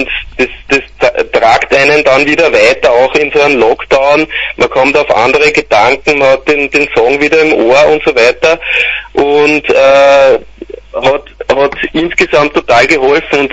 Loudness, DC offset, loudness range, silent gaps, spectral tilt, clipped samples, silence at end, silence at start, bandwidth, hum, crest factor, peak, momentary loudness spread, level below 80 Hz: -8 LUFS; under 0.1%; 2 LU; none; -4 dB/octave; 0.7%; 0 s; 0 s; 11 kHz; none; 8 dB; 0 dBFS; 6 LU; -36 dBFS